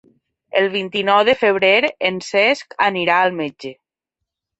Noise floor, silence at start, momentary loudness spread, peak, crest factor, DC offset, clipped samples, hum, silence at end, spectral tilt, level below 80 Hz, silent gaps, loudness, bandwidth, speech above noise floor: -82 dBFS; 0.55 s; 11 LU; -2 dBFS; 18 dB; under 0.1%; under 0.1%; none; 0.85 s; -4 dB/octave; -64 dBFS; none; -16 LUFS; 8.2 kHz; 65 dB